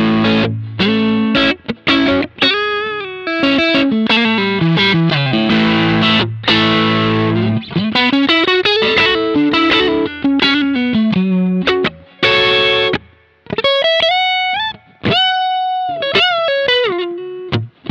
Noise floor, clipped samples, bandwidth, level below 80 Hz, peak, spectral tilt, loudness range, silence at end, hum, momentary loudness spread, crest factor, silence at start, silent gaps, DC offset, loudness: -45 dBFS; under 0.1%; 8 kHz; -46 dBFS; -2 dBFS; -6 dB/octave; 2 LU; 0 s; none; 8 LU; 12 dB; 0 s; none; under 0.1%; -13 LUFS